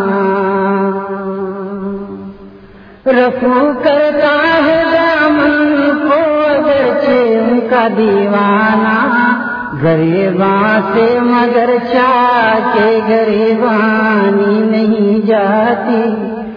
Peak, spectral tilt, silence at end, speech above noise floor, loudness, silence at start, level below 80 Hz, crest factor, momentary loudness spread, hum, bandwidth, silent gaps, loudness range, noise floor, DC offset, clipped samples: 0 dBFS; -8.5 dB/octave; 0 s; 26 dB; -11 LUFS; 0 s; -48 dBFS; 10 dB; 9 LU; none; 5.2 kHz; none; 3 LU; -37 dBFS; under 0.1%; under 0.1%